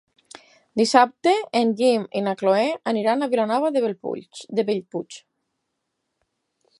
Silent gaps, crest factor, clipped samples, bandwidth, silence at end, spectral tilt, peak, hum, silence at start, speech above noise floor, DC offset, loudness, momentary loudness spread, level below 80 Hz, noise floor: none; 22 dB; under 0.1%; 11.5 kHz; 1.6 s; -4.5 dB/octave; -2 dBFS; none; 0.75 s; 56 dB; under 0.1%; -21 LUFS; 14 LU; -76 dBFS; -78 dBFS